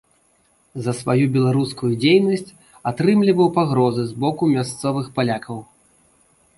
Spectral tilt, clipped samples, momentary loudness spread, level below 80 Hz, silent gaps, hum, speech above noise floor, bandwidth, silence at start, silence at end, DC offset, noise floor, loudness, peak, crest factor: -6.5 dB/octave; under 0.1%; 12 LU; -58 dBFS; none; none; 42 dB; 11.5 kHz; 0.75 s; 0.95 s; under 0.1%; -60 dBFS; -19 LUFS; -4 dBFS; 16 dB